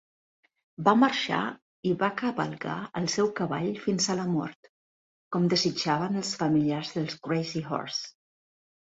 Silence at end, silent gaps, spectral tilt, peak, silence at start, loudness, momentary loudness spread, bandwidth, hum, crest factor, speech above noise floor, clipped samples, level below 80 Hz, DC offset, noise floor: 0.75 s; 1.62-1.83 s, 4.56-4.63 s, 4.69-5.31 s; -4.5 dB/octave; -8 dBFS; 0.8 s; -28 LUFS; 10 LU; 8 kHz; none; 22 dB; over 62 dB; under 0.1%; -66 dBFS; under 0.1%; under -90 dBFS